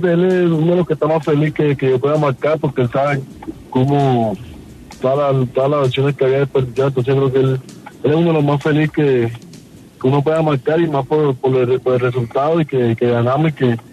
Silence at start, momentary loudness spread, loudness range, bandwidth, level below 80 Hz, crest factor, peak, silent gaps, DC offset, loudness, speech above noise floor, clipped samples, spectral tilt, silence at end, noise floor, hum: 0 s; 5 LU; 2 LU; 11.5 kHz; -48 dBFS; 14 dB; -2 dBFS; none; under 0.1%; -16 LUFS; 24 dB; under 0.1%; -8.5 dB/octave; 0.1 s; -39 dBFS; none